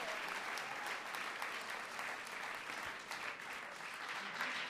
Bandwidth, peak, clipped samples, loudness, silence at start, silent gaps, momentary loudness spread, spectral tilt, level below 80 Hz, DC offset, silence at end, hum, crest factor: 15.5 kHz; -22 dBFS; under 0.1%; -43 LUFS; 0 s; none; 4 LU; -1 dB/octave; -80 dBFS; under 0.1%; 0 s; none; 22 dB